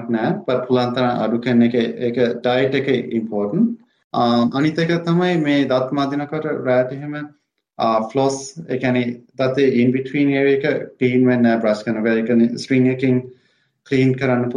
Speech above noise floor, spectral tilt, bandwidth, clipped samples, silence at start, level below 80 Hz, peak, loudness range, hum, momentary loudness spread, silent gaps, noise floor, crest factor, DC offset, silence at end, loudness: 43 dB; -7 dB/octave; 10 kHz; under 0.1%; 0 s; -62 dBFS; -4 dBFS; 3 LU; none; 7 LU; 4.04-4.10 s; -61 dBFS; 14 dB; under 0.1%; 0 s; -18 LUFS